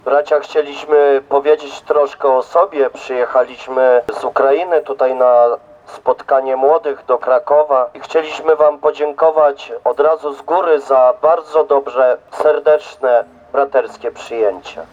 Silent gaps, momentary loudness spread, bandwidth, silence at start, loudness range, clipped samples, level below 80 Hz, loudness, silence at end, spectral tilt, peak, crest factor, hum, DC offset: none; 7 LU; 7.8 kHz; 0.05 s; 1 LU; under 0.1%; -60 dBFS; -14 LUFS; 0.1 s; -4 dB/octave; 0 dBFS; 12 dB; none; under 0.1%